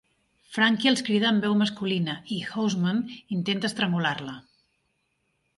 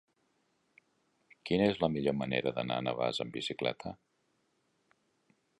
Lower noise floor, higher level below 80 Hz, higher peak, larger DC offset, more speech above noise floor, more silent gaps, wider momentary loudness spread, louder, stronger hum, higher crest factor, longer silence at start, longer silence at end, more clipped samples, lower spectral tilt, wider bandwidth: about the same, -74 dBFS vs -77 dBFS; about the same, -68 dBFS vs -64 dBFS; first, -8 dBFS vs -14 dBFS; neither; first, 49 dB vs 44 dB; neither; second, 10 LU vs 15 LU; first, -25 LUFS vs -33 LUFS; neither; about the same, 18 dB vs 22 dB; second, 0.5 s vs 1.45 s; second, 1.2 s vs 1.65 s; neither; about the same, -5 dB/octave vs -6 dB/octave; about the same, 11.5 kHz vs 11 kHz